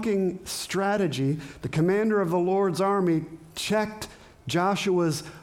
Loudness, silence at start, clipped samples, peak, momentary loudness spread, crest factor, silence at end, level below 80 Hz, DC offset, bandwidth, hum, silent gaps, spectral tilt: -26 LUFS; 0 s; under 0.1%; -12 dBFS; 9 LU; 12 dB; 0 s; -58 dBFS; under 0.1%; 17 kHz; none; none; -5.5 dB/octave